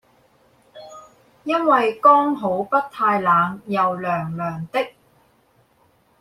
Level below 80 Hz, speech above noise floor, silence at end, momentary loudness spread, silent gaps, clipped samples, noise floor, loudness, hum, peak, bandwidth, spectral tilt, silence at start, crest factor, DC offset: -64 dBFS; 41 dB; 1.3 s; 13 LU; none; under 0.1%; -60 dBFS; -19 LUFS; none; -2 dBFS; 14.5 kHz; -7 dB/octave; 0.75 s; 20 dB; under 0.1%